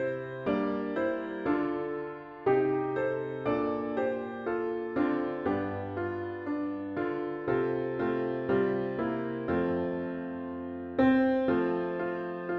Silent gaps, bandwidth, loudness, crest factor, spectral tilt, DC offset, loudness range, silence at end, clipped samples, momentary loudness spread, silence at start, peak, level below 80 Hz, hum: none; 5.6 kHz; -31 LUFS; 18 dB; -9.5 dB/octave; under 0.1%; 3 LU; 0 s; under 0.1%; 8 LU; 0 s; -12 dBFS; -62 dBFS; none